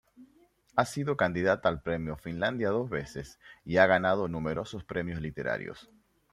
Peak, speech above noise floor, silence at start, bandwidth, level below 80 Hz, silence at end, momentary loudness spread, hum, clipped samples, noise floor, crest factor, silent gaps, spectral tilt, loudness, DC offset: -8 dBFS; 34 dB; 0.2 s; 14.5 kHz; -56 dBFS; 0.5 s; 16 LU; none; under 0.1%; -64 dBFS; 24 dB; none; -6 dB/octave; -30 LUFS; under 0.1%